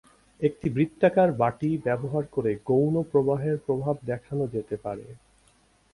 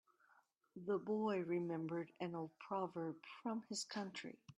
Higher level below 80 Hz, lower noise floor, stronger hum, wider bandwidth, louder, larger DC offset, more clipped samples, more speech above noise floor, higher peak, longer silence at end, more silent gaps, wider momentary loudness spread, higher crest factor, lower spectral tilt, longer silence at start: first, -58 dBFS vs -88 dBFS; second, -62 dBFS vs -76 dBFS; neither; about the same, 11.5 kHz vs 12.5 kHz; first, -26 LUFS vs -45 LUFS; neither; neither; first, 37 dB vs 31 dB; first, -8 dBFS vs -30 dBFS; first, 0.8 s vs 0.05 s; neither; about the same, 9 LU vs 9 LU; about the same, 18 dB vs 16 dB; first, -9 dB/octave vs -5 dB/octave; second, 0.4 s vs 0.75 s